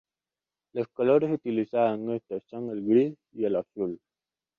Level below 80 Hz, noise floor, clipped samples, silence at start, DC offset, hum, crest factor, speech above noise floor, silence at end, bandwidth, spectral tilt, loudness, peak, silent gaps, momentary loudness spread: -72 dBFS; under -90 dBFS; under 0.1%; 0.75 s; under 0.1%; none; 18 dB; over 63 dB; 0.6 s; 4.9 kHz; -9.5 dB/octave; -28 LUFS; -10 dBFS; none; 12 LU